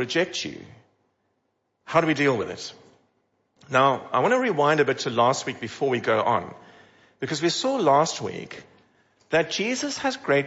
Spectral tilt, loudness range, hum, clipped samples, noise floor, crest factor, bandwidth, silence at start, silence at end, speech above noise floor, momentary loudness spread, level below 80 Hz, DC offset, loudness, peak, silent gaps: -4 dB/octave; 5 LU; none; under 0.1%; -74 dBFS; 18 dB; 8 kHz; 0 s; 0 s; 51 dB; 15 LU; -68 dBFS; under 0.1%; -23 LUFS; -6 dBFS; none